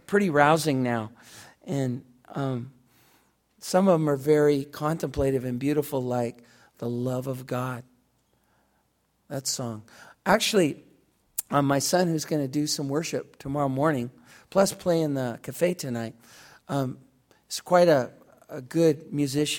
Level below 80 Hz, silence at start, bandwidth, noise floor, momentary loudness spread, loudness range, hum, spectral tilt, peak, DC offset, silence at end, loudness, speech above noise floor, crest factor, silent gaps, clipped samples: -56 dBFS; 0.1 s; 17.5 kHz; -70 dBFS; 15 LU; 7 LU; none; -5 dB/octave; -4 dBFS; under 0.1%; 0 s; -26 LUFS; 45 dB; 24 dB; none; under 0.1%